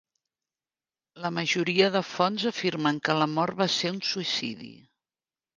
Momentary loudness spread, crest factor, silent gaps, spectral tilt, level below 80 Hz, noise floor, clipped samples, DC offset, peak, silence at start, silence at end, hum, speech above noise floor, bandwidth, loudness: 10 LU; 22 dB; none; -4.5 dB/octave; -72 dBFS; under -90 dBFS; under 0.1%; under 0.1%; -8 dBFS; 1.15 s; 0.85 s; none; over 63 dB; 9.8 kHz; -26 LUFS